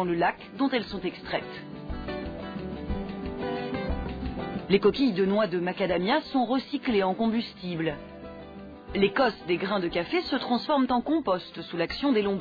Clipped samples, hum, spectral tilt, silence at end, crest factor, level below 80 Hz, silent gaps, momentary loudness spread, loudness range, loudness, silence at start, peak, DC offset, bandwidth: under 0.1%; none; -8 dB/octave; 0 s; 18 dB; -46 dBFS; none; 12 LU; 8 LU; -28 LUFS; 0 s; -10 dBFS; under 0.1%; 5 kHz